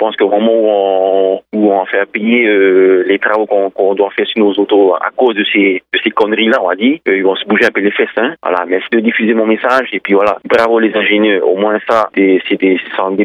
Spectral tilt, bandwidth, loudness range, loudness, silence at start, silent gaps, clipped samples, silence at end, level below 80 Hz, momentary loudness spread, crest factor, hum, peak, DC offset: -6 dB/octave; 7.2 kHz; 1 LU; -11 LUFS; 0 s; none; under 0.1%; 0 s; -62 dBFS; 4 LU; 10 dB; none; 0 dBFS; under 0.1%